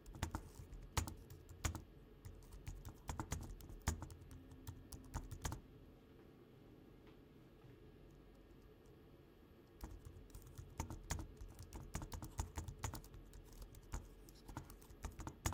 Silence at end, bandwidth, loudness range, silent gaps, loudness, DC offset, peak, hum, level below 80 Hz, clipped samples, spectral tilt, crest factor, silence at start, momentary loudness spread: 0 s; 17.5 kHz; 13 LU; none; -52 LUFS; under 0.1%; -24 dBFS; none; -56 dBFS; under 0.1%; -4.5 dB/octave; 28 dB; 0 s; 17 LU